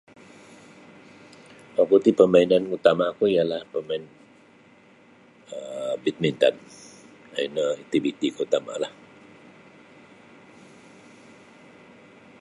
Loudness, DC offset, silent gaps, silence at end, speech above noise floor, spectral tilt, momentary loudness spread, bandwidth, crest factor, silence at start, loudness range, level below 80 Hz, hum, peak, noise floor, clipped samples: -23 LUFS; under 0.1%; none; 3.5 s; 32 dB; -6 dB/octave; 18 LU; 11.5 kHz; 24 dB; 1.75 s; 9 LU; -68 dBFS; none; -2 dBFS; -54 dBFS; under 0.1%